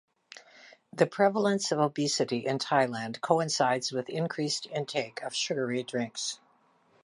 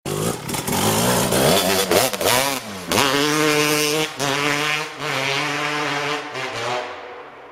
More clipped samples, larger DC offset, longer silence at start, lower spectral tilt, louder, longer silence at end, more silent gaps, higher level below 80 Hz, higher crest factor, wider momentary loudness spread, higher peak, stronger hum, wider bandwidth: neither; neither; first, 0.35 s vs 0.05 s; about the same, -4 dB/octave vs -3 dB/octave; second, -29 LUFS vs -19 LUFS; first, 0.7 s vs 0 s; neither; second, -80 dBFS vs -48 dBFS; about the same, 22 dB vs 20 dB; about the same, 9 LU vs 9 LU; second, -8 dBFS vs 0 dBFS; neither; second, 11.5 kHz vs 16.5 kHz